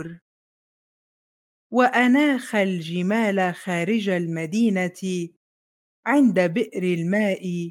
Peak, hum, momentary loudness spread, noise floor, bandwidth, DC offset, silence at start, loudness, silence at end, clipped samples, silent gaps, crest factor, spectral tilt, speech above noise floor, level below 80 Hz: -4 dBFS; none; 10 LU; under -90 dBFS; 16 kHz; under 0.1%; 0 s; -22 LUFS; 0 s; under 0.1%; 0.21-1.70 s, 5.36-6.03 s; 18 dB; -6 dB/octave; over 69 dB; -76 dBFS